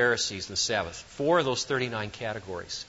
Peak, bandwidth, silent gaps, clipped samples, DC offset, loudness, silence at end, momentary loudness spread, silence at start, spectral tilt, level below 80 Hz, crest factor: -10 dBFS; 8 kHz; none; under 0.1%; under 0.1%; -29 LUFS; 0 s; 11 LU; 0 s; -3 dB/octave; -58 dBFS; 18 dB